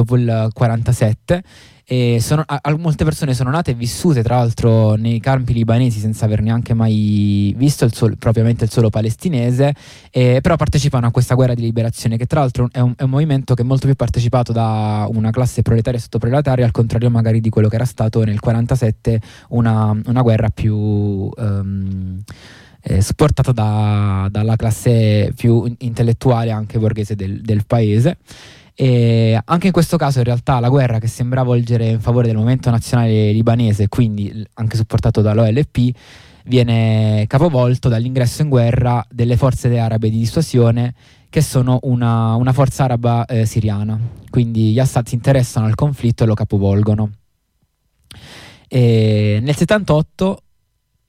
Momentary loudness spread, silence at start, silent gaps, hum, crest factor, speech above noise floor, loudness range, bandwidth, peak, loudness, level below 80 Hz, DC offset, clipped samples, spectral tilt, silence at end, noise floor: 6 LU; 0 s; none; none; 12 dB; 50 dB; 2 LU; 14.5 kHz; -4 dBFS; -16 LUFS; -36 dBFS; under 0.1%; under 0.1%; -7.5 dB/octave; 0.7 s; -65 dBFS